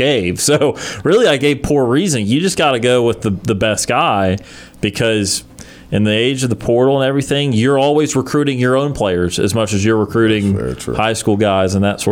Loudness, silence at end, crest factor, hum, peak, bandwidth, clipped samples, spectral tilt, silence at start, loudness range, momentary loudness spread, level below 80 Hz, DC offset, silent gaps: -15 LUFS; 0 s; 12 dB; none; -4 dBFS; 17 kHz; under 0.1%; -5 dB/octave; 0 s; 2 LU; 5 LU; -40 dBFS; under 0.1%; none